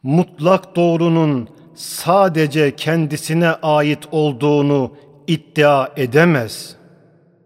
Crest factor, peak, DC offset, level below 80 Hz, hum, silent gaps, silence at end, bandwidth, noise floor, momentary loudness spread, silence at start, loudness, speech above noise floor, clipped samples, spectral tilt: 16 dB; 0 dBFS; under 0.1%; -62 dBFS; none; none; 0.75 s; 16 kHz; -51 dBFS; 13 LU; 0.05 s; -16 LUFS; 36 dB; under 0.1%; -6 dB/octave